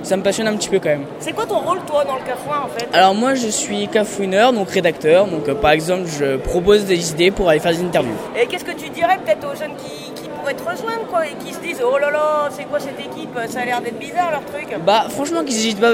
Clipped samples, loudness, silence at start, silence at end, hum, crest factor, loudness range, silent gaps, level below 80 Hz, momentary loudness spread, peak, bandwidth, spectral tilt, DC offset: under 0.1%; -18 LUFS; 0 s; 0 s; none; 16 dB; 5 LU; none; -44 dBFS; 11 LU; -2 dBFS; 16.5 kHz; -4 dB/octave; under 0.1%